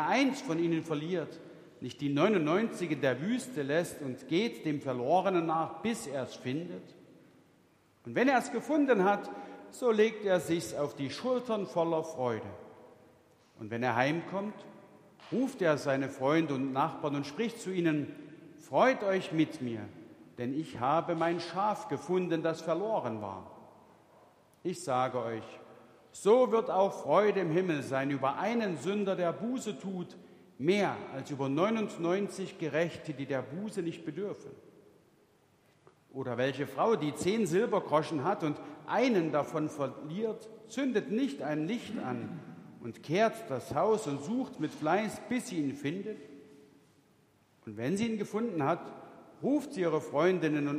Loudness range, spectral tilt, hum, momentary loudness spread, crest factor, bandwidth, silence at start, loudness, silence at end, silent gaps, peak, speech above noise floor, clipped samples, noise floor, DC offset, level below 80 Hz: 6 LU; -6 dB/octave; none; 15 LU; 22 dB; 15.5 kHz; 0 s; -32 LUFS; 0 s; none; -12 dBFS; 35 dB; under 0.1%; -67 dBFS; under 0.1%; -76 dBFS